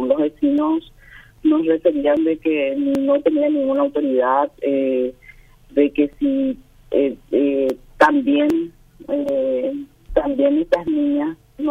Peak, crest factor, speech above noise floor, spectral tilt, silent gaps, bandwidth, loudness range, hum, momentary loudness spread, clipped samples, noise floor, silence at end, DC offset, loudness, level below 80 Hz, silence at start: -2 dBFS; 16 dB; 27 dB; -6.5 dB/octave; none; 6.8 kHz; 2 LU; none; 7 LU; under 0.1%; -46 dBFS; 0 s; under 0.1%; -19 LUFS; -46 dBFS; 0 s